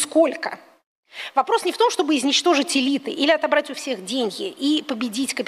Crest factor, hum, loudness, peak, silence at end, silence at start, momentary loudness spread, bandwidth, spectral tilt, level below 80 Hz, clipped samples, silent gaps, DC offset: 18 dB; none; -21 LUFS; -4 dBFS; 0 s; 0 s; 11 LU; 15.5 kHz; -2 dB/octave; -74 dBFS; under 0.1%; 0.86-1.03 s; under 0.1%